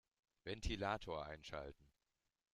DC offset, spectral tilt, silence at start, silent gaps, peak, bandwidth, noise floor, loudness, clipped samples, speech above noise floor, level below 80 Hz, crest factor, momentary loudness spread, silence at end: under 0.1%; -5 dB/octave; 0.45 s; none; -28 dBFS; 13.5 kHz; under -90 dBFS; -47 LUFS; under 0.1%; over 44 dB; -58 dBFS; 20 dB; 11 LU; 0.7 s